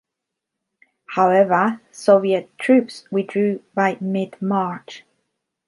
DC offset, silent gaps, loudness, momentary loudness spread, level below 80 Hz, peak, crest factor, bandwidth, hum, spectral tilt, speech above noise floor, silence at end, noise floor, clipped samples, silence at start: under 0.1%; none; -19 LUFS; 10 LU; -72 dBFS; -2 dBFS; 18 dB; 11.5 kHz; none; -6.5 dB/octave; 64 dB; 0.7 s; -82 dBFS; under 0.1%; 1.1 s